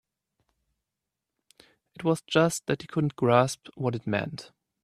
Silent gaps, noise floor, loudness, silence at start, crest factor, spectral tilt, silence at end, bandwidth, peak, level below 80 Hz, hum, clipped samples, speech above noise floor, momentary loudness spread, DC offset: none; -87 dBFS; -27 LUFS; 2 s; 24 dB; -5.5 dB/octave; 0.4 s; 14.5 kHz; -6 dBFS; -66 dBFS; none; under 0.1%; 60 dB; 9 LU; under 0.1%